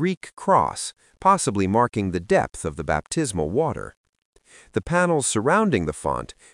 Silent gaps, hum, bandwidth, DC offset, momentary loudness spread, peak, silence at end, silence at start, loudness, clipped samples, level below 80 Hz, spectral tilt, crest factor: 0.17-0.21 s, 3.97-4.13 s, 4.25-4.33 s; none; 12 kHz; under 0.1%; 11 LU; -4 dBFS; 0.3 s; 0 s; -23 LUFS; under 0.1%; -48 dBFS; -5 dB/octave; 20 dB